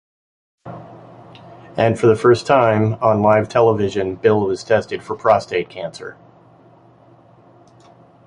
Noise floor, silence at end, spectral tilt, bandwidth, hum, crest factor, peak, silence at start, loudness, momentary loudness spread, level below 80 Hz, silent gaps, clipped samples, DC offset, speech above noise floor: -48 dBFS; 2.15 s; -7 dB/octave; 11 kHz; none; 18 dB; -2 dBFS; 0.65 s; -16 LUFS; 21 LU; -52 dBFS; none; under 0.1%; under 0.1%; 32 dB